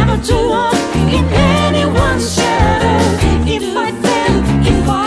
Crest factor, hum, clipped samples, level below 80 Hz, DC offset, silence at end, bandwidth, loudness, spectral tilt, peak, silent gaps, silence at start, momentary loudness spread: 12 dB; none; under 0.1%; -22 dBFS; under 0.1%; 0 s; 11 kHz; -13 LUFS; -5.5 dB/octave; 0 dBFS; none; 0 s; 3 LU